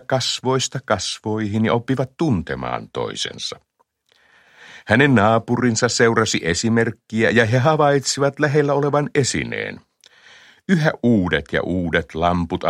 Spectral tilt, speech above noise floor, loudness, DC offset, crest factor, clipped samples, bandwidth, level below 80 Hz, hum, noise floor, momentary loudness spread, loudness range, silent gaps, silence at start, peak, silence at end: -5 dB/octave; 44 dB; -19 LUFS; under 0.1%; 18 dB; under 0.1%; 12.5 kHz; -46 dBFS; none; -62 dBFS; 10 LU; 6 LU; none; 0.1 s; -2 dBFS; 0 s